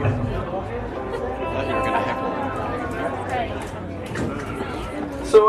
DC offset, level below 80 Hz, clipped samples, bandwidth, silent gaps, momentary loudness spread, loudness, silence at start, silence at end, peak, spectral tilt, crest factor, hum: under 0.1%; -38 dBFS; under 0.1%; 13 kHz; none; 7 LU; -26 LUFS; 0 s; 0 s; -2 dBFS; -6.5 dB/octave; 22 dB; none